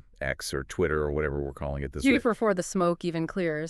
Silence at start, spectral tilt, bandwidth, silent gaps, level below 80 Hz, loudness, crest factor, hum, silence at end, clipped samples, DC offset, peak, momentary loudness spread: 0.2 s; -5.5 dB/octave; 13.5 kHz; none; -42 dBFS; -28 LUFS; 18 dB; none; 0 s; under 0.1%; under 0.1%; -10 dBFS; 9 LU